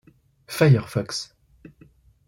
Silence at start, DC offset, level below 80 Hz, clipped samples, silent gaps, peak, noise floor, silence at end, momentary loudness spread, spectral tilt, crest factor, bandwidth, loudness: 0.5 s; under 0.1%; -58 dBFS; under 0.1%; none; -6 dBFS; -55 dBFS; 1.05 s; 16 LU; -6 dB/octave; 20 dB; 16.5 kHz; -22 LUFS